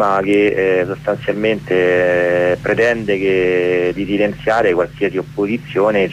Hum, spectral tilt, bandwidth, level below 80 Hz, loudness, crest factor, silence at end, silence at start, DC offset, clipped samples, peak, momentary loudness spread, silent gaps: none; -6.5 dB/octave; 11.5 kHz; -44 dBFS; -16 LUFS; 12 dB; 0 s; 0 s; under 0.1%; under 0.1%; -4 dBFS; 6 LU; none